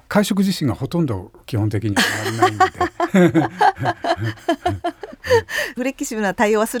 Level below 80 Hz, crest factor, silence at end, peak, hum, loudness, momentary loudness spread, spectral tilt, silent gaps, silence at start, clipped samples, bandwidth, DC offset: -50 dBFS; 16 dB; 0 s; -2 dBFS; none; -19 LUFS; 8 LU; -5.5 dB/octave; none; 0.1 s; under 0.1%; over 20 kHz; under 0.1%